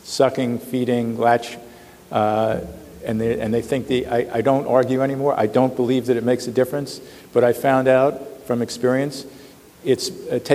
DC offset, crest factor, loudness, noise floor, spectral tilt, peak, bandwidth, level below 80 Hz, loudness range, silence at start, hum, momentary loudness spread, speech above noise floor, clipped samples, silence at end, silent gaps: under 0.1%; 18 dB; -20 LUFS; -44 dBFS; -6 dB/octave; -2 dBFS; 16 kHz; -54 dBFS; 3 LU; 0.05 s; none; 11 LU; 24 dB; under 0.1%; 0 s; none